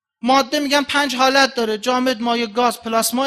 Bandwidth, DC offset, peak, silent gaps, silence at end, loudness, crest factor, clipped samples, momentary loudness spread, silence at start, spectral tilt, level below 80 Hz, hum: 15 kHz; under 0.1%; 0 dBFS; none; 0 s; -17 LUFS; 18 dB; under 0.1%; 5 LU; 0.25 s; -2 dB/octave; -58 dBFS; none